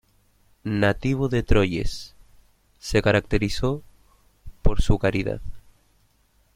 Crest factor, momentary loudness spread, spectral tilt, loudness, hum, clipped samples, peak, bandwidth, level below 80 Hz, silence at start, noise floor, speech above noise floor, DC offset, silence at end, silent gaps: 20 dB; 15 LU; -6.5 dB/octave; -24 LUFS; none; under 0.1%; -4 dBFS; 13 kHz; -32 dBFS; 0.65 s; -62 dBFS; 41 dB; under 0.1%; 0.95 s; none